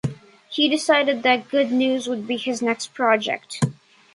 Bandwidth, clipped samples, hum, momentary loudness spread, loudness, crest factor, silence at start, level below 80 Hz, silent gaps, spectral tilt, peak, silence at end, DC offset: 11.5 kHz; under 0.1%; none; 8 LU; -21 LUFS; 20 dB; 0.05 s; -60 dBFS; none; -4.5 dB/octave; -2 dBFS; 0.4 s; under 0.1%